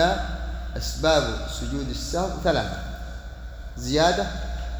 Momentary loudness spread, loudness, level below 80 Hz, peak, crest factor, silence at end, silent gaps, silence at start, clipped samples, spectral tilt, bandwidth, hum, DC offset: 17 LU; -25 LUFS; -32 dBFS; -6 dBFS; 20 dB; 0 s; none; 0 s; under 0.1%; -4.5 dB/octave; over 20 kHz; none; under 0.1%